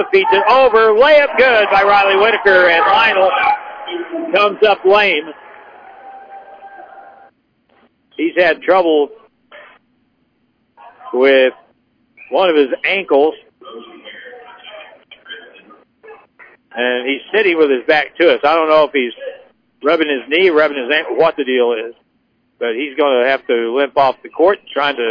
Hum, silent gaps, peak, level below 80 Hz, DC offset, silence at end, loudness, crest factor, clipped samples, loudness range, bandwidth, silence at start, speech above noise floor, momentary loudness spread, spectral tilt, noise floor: none; none; -2 dBFS; -54 dBFS; under 0.1%; 0 s; -13 LUFS; 14 dB; under 0.1%; 9 LU; 5.4 kHz; 0 s; 49 dB; 20 LU; -5 dB/octave; -61 dBFS